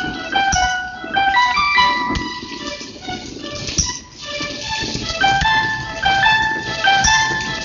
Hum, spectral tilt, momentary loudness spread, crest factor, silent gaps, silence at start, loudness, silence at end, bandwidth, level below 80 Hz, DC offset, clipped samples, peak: none; -1.5 dB/octave; 14 LU; 18 dB; none; 0 s; -17 LUFS; 0 s; 7.6 kHz; -36 dBFS; under 0.1%; under 0.1%; -2 dBFS